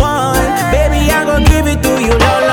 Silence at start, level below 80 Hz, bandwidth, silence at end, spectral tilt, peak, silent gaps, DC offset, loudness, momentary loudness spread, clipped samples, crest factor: 0 s; -16 dBFS; 19 kHz; 0 s; -5 dB/octave; 0 dBFS; none; under 0.1%; -11 LUFS; 2 LU; 0.4%; 10 dB